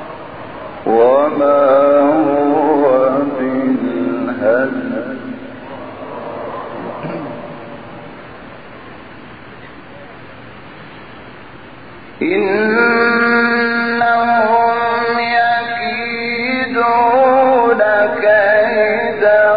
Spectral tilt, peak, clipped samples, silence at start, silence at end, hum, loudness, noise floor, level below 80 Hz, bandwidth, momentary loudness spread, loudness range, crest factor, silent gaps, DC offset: -3 dB/octave; -2 dBFS; under 0.1%; 0 s; 0 s; none; -13 LUFS; -36 dBFS; -54 dBFS; 5 kHz; 24 LU; 21 LU; 14 dB; none; 0.8%